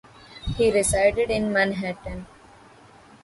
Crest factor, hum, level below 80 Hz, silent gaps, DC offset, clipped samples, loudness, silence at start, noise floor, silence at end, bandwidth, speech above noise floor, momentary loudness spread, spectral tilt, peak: 18 dB; none; -42 dBFS; none; under 0.1%; under 0.1%; -22 LUFS; 0.3 s; -50 dBFS; 1 s; 11.5 kHz; 28 dB; 17 LU; -4 dB/octave; -6 dBFS